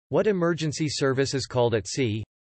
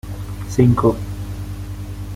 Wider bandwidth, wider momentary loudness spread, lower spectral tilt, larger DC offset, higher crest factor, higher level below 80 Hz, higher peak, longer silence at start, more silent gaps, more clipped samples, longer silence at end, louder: second, 8.8 kHz vs 16 kHz; second, 4 LU vs 16 LU; second, -5 dB/octave vs -8 dB/octave; neither; about the same, 14 dB vs 18 dB; second, -56 dBFS vs -34 dBFS; second, -12 dBFS vs -2 dBFS; about the same, 0.1 s vs 0.05 s; neither; neither; first, 0.2 s vs 0 s; second, -25 LUFS vs -20 LUFS